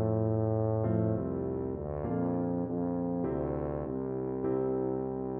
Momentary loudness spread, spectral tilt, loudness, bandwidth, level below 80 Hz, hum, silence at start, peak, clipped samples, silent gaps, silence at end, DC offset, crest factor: 5 LU; -12.5 dB/octave; -32 LUFS; 2.6 kHz; -52 dBFS; none; 0 s; -18 dBFS; under 0.1%; none; 0 s; under 0.1%; 14 dB